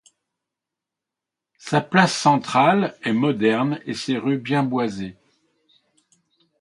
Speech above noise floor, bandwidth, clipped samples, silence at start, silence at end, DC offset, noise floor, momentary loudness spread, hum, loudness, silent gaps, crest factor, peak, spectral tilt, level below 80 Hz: 66 dB; 11.5 kHz; under 0.1%; 1.65 s; 1.5 s; under 0.1%; -86 dBFS; 10 LU; none; -20 LUFS; none; 22 dB; 0 dBFS; -5.5 dB/octave; -64 dBFS